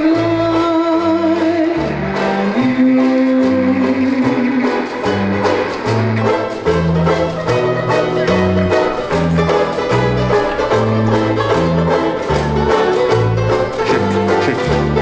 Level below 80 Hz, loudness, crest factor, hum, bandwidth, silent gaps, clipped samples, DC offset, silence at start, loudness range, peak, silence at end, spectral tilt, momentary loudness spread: -34 dBFS; -15 LUFS; 12 dB; none; 8 kHz; none; under 0.1%; under 0.1%; 0 s; 1 LU; -2 dBFS; 0 s; -7 dB/octave; 3 LU